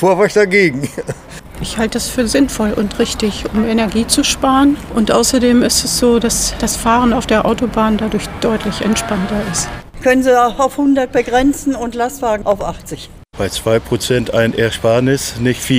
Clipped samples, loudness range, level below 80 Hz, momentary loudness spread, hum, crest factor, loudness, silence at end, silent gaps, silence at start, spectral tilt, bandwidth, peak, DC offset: under 0.1%; 4 LU; -32 dBFS; 9 LU; none; 14 dB; -14 LUFS; 0 s; none; 0 s; -4 dB/octave; 16 kHz; 0 dBFS; under 0.1%